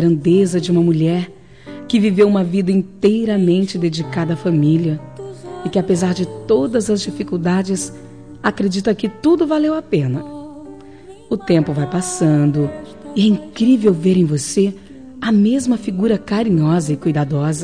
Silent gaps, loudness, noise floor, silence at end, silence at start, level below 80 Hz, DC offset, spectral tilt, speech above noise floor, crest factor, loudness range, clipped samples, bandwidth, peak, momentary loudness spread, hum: none; -17 LUFS; -39 dBFS; 0 s; 0 s; -50 dBFS; 0.4%; -6.5 dB/octave; 23 dB; 14 dB; 3 LU; under 0.1%; 10.5 kHz; -4 dBFS; 12 LU; none